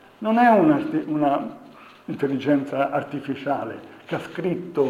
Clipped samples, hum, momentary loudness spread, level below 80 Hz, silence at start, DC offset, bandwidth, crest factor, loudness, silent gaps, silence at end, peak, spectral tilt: under 0.1%; none; 17 LU; -70 dBFS; 0.2 s; under 0.1%; 11.5 kHz; 18 dB; -22 LUFS; none; 0 s; -4 dBFS; -8 dB/octave